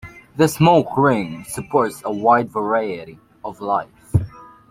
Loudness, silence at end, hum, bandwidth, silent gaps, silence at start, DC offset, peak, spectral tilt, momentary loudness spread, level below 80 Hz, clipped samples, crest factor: -19 LUFS; 0.25 s; none; 16.5 kHz; none; 0.05 s; under 0.1%; -2 dBFS; -6.5 dB/octave; 17 LU; -46 dBFS; under 0.1%; 18 dB